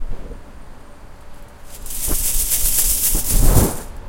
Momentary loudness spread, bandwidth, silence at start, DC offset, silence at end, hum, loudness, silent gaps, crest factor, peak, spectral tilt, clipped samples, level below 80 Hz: 21 LU; 16.5 kHz; 0 s; under 0.1%; 0 s; none; -17 LUFS; none; 18 dB; 0 dBFS; -3 dB/octave; under 0.1%; -22 dBFS